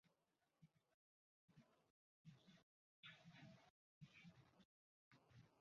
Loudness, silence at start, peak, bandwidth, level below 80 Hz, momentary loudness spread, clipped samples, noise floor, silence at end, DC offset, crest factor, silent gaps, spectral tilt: -66 LUFS; 0.05 s; -50 dBFS; 7 kHz; under -90 dBFS; 5 LU; under 0.1%; -89 dBFS; 0 s; under 0.1%; 22 dB; 0.94-1.48 s, 1.90-2.25 s, 2.63-3.03 s, 3.70-4.01 s, 4.65-5.11 s; -4 dB/octave